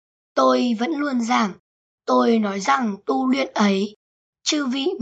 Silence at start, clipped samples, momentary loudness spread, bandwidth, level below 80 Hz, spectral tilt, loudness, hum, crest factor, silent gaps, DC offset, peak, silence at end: 0.35 s; under 0.1%; 8 LU; 8.2 kHz; -72 dBFS; -4.5 dB/octave; -21 LUFS; none; 16 dB; 1.59-1.98 s, 3.96-4.33 s; under 0.1%; -6 dBFS; 0 s